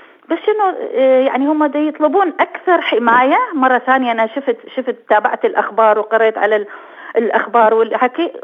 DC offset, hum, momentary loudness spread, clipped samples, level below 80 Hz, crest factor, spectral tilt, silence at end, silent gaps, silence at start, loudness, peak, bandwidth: under 0.1%; none; 9 LU; under 0.1%; -72 dBFS; 14 dB; -6 dB/octave; 0.05 s; none; 0.3 s; -14 LUFS; 0 dBFS; 5.2 kHz